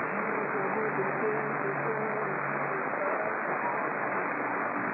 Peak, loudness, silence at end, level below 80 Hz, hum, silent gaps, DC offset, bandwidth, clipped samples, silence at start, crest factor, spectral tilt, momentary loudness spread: -18 dBFS; -30 LUFS; 0 s; under -90 dBFS; none; none; under 0.1%; 4.8 kHz; under 0.1%; 0 s; 12 dB; -11.5 dB/octave; 1 LU